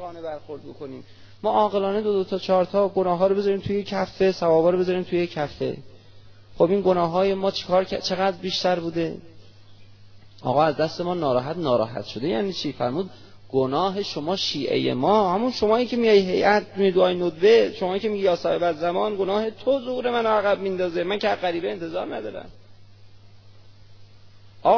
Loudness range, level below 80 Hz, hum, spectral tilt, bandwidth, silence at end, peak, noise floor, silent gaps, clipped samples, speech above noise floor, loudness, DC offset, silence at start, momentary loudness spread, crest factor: 6 LU; -56 dBFS; none; -6 dB/octave; 5.4 kHz; 0 s; -4 dBFS; -47 dBFS; none; under 0.1%; 24 dB; -23 LUFS; under 0.1%; 0 s; 11 LU; 18 dB